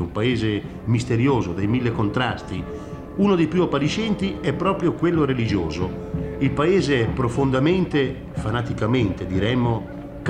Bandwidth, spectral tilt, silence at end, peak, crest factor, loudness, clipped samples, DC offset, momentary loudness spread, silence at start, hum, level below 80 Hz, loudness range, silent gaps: 10 kHz; -7 dB/octave; 0 s; -6 dBFS; 16 dB; -22 LUFS; under 0.1%; 0.1%; 9 LU; 0 s; none; -40 dBFS; 1 LU; none